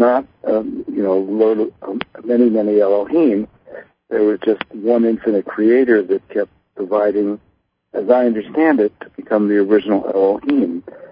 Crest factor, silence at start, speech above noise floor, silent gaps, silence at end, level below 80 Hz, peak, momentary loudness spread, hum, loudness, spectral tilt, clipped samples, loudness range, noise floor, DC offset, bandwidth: 16 dB; 0 s; 22 dB; none; 0.05 s; -58 dBFS; 0 dBFS; 10 LU; none; -17 LUFS; -11.5 dB/octave; under 0.1%; 1 LU; -38 dBFS; under 0.1%; 5.2 kHz